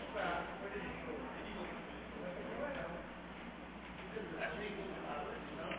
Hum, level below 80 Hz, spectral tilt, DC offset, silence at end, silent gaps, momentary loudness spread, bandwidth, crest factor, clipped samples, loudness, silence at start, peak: none; -60 dBFS; -3.5 dB/octave; under 0.1%; 0 s; none; 8 LU; 4 kHz; 16 dB; under 0.1%; -45 LUFS; 0 s; -28 dBFS